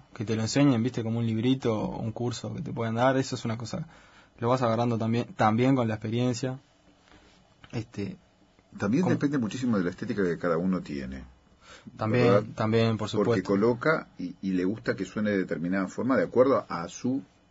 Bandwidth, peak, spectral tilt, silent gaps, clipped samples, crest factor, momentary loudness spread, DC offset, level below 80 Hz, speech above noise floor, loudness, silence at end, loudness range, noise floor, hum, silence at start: 8 kHz; -10 dBFS; -6.5 dB/octave; none; under 0.1%; 18 dB; 13 LU; under 0.1%; -58 dBFS; 31 dB; -27 LUFS; 0.25 s; 4 LU; -58 dBFS; none; 0.2 s